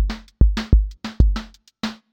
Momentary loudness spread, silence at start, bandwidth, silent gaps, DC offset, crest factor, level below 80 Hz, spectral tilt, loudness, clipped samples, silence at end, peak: 11 LU; 0 s; 7.2 kHz; none; under 0.1%; 18 dB; -20 dBFS; -7 dB/octave; -22 LUFS; under 0.1%; 0.2 s; 0 dBFS